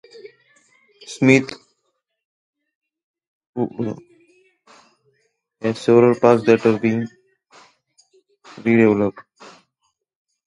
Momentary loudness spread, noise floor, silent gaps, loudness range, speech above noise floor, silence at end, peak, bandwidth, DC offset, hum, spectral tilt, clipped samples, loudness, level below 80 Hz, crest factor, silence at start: 19 LU; -73 dBFS; 2.25-2.53 s, 2.75-2.81 s, 3.04-3.14 s, 3.27-3.53 s; 14 LU; 57 dB; 1.25 s; 0 dBFS; 10.5 kHz; under 0.1%; none; -7 dB/octave; under 0.1%; -17 LUFS; -62 dBFS; 22 dB; 0.25 s